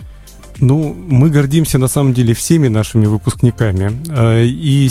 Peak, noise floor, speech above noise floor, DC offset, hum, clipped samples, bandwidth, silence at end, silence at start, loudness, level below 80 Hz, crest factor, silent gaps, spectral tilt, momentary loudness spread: 0 dBFS; -35 dBFS; 23 dB; under 0.1%; none; under 0.1%; 15.5 kHz; 0 s; 0 s; -13 LUFS; -34 dBFS; 12 dB; none; -6.5 dB/octave; 4 LU